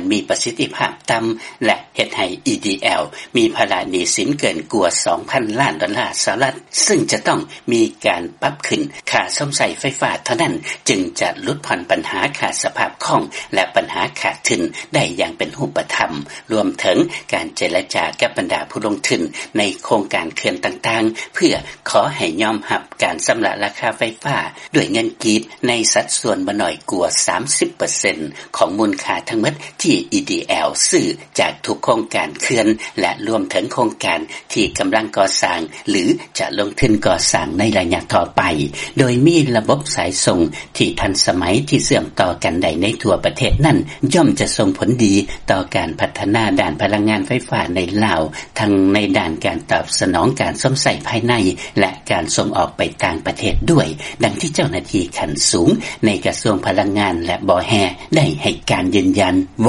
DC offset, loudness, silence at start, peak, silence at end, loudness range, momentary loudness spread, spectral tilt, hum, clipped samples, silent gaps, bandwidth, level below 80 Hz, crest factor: under 0.1%; -17 LUFS; 0 s; 0 dBFS; 0 s; 3 LU; 6 LU; -4 dB/octave; none; under 0.1%; none; 11.5 kHz; -38 dBFS; 18 dB